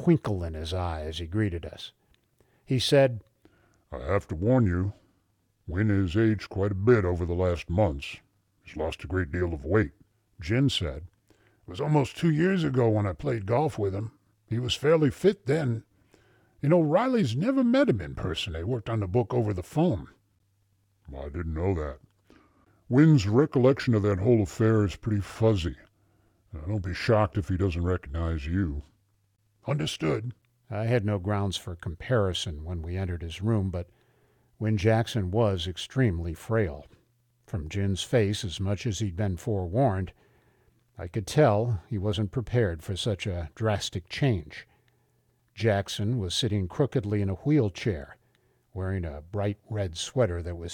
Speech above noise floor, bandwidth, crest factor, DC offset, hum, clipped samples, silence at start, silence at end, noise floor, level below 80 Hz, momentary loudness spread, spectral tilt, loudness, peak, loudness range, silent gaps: 44 dB; 13.5 kHz; 18 dB; under 0.1%; none; under 0.1%; 0 s; 0 s; -70 dBFS; -46 dBFS; 13 LU; -6.5 dB/octave; -27 LUFS; -8 dBFS; 5 LU; none